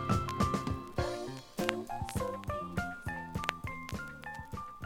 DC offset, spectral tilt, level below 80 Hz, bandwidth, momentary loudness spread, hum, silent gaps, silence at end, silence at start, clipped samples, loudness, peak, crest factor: under 0.1%; -5.5 dB/octave; -50 dBFS; 17.5 kHz; 10 LU; none; none; 0 s; 0 s; under 0.1%; -37 LUFS; -6 dBFS; 30 dB